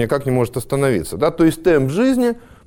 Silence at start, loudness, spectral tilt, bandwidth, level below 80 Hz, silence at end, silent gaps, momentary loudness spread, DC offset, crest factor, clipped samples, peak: 0 s; -17 LUFS; -6.5 dB/octave; 17.5 kHz; -40 dBFS; 0.3 s; none; 5 LU; under 0.1%; 12 dB; under 0.1%; -4 dBFS